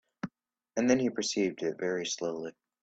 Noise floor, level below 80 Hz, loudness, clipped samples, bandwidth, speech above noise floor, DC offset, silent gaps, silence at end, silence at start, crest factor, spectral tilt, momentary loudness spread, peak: -64 dBFS; -70 dBFS; -31 LUFS; under 0.1%; 8.8 kHz; 34 dB; under 0.1%; none; 0.3 s; 0.25 s; 20 dB; -4 dB/octave; 16 LU; -12 dBFS